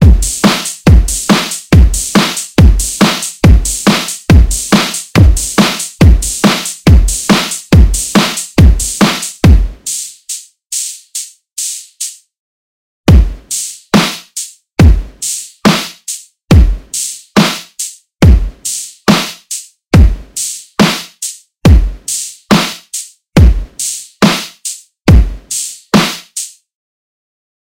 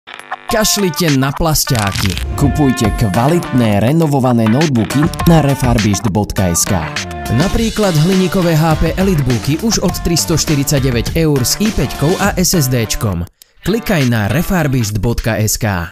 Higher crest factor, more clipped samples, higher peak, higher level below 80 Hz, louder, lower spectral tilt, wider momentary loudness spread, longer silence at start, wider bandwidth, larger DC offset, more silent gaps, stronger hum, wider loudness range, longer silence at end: about the same, 10 dB vs 14 dB; first, 2% vs under 0.1%; about the same, 0 dBFS vs 0 dBFS; first, -14 dBFS vs -26 dBFS; about the same, -11 LUFS vs -13 LUFS; about the same, -4.5 dB/octave vs -5 dB/octave; first, 13 LU vs 5 LU; about the same, 0 s vs 0.05 s; about the same, 16.5 kHz vs 16 kHz; neither; first, 12.39-13.04 s vs none; neither; first, 5 LU vs 2 LU; first, 1.3 s vs 0 s